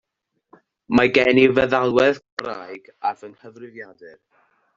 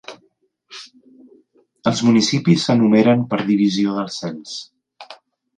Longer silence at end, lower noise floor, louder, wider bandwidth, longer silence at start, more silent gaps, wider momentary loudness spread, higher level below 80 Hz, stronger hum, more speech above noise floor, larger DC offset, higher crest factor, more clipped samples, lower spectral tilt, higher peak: first, 0.65 s vs 0.45 s; first, -73 dBFS vs -63 dBFS; about the same, -18 LUFS vs -17 LUFS; second, 7.6 kHz vs 9.6 kHz; first, 0.9 s vs 0.1 s; first, 2.32-2.37 s vs none; about the same, 23 LU vs 23 LU; first, -54 dBFS vs -60 dBFS; neither; first, 53 dB vs 46 dB; neither; about the same, 18 dB vs 18 dB; neither; about the same, -6 dB/octave vs -5.5 dB/octave; about the same, -2 dBFS vs -2 dBFS